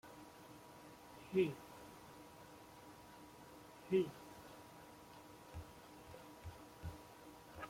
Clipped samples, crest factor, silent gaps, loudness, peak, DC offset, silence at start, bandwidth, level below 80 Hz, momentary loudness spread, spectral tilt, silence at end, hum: under 0.1%; 24 dB; none; -45 LUFS; -24 dBFS; under 0.1%; 0.05 s; 16.5 kHz; -68 dBFS; 20 LU; -6 dB/octave; 0 s; none